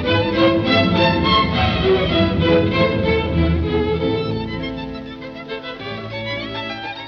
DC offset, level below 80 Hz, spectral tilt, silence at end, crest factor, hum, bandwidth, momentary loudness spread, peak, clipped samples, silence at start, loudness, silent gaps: under 0.1%; -32 dBFS; -7.5 dB/octave; 0 s; 16 dB; none; 6.6 kHz; 13 LU; -4 dBFS; under 0.1%; 0 s; -18 LUFS; none